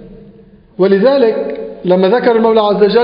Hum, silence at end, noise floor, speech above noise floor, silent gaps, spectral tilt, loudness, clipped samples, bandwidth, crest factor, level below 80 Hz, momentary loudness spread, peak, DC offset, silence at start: none; 0 s; -41 dBFS; 31 dB; none; -5 dB/octave; -11 LUFS; under 0.1%; 5.2 kHz; 12 dB; -48 dBFS; 9 LU; 0 dBFS; under 0.1%; 0 s